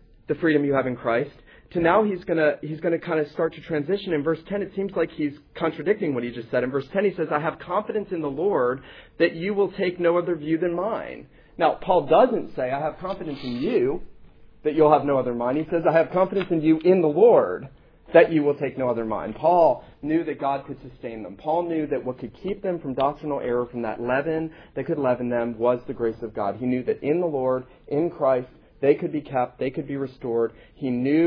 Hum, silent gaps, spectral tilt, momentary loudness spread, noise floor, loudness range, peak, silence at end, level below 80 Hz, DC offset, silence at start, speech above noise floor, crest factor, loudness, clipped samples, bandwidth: none; none; -9.5 dB/octave; 12 LU; -47 dBFS; 6 LU; -2 dBFS; 0 s; -54 dBFS; under 0.1%; 0.3 s; 24 dB; 22 dB; -24 LUFS; under 0.1%; 5.4 kHz